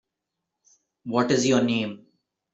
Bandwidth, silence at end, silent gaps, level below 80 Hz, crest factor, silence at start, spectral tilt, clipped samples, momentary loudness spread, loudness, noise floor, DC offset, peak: 8.2 kHz; 0.55 s; none; -66 dBFS; 20 dB; 1.05 s; -4.5 dB/octave; under 0.1%; 19 LU; -23 LUFS; -84 dBFS; under 0.1%; -8 dBFS